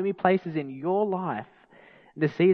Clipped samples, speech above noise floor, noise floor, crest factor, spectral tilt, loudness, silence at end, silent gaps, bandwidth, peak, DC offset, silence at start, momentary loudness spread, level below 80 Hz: under 0.1%; 29 dB; -54 dBFS; 20 dB; -9.5 dB/octave; -27 LUFS; 0 s; none; 5.6 kHz; -6 dBFS; under 0.1%; 0 s; 10 LU; -74 dBFS